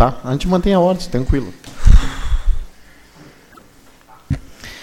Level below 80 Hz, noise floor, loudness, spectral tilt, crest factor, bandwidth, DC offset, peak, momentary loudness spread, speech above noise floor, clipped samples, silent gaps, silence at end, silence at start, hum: -20 dBFS; -46 dBFS; -18 LUFS; -7 dB/octave; 16 dB; 11.5 kHz; under 0.1%; 0 dBFS; 12 LU; 29 dB; under 0.1%; none; 0 s; 0 s; none